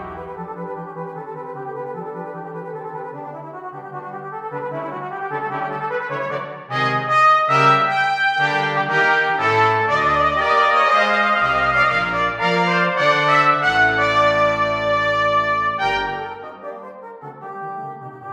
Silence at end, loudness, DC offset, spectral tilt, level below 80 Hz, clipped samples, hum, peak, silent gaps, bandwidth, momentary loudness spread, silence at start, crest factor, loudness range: 0 s; -17 LUFS; under 0.1%; -4.5 dB/octave; -50 dBFS; under 0.1%; none; -2 dBFS; none; 10 kHz; 18 LU; 0 s; 16 dB; 15 LU